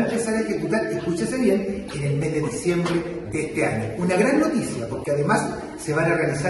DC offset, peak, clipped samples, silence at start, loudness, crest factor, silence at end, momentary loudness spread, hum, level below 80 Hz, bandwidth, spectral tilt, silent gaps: under 0.1%; -6 dBFS; under 0.1%; 0 s; -23 LUFS; 16 dB; 0 s; 7 LU; none; -48 dBFS; 12 kHz; -6 dB/octave; none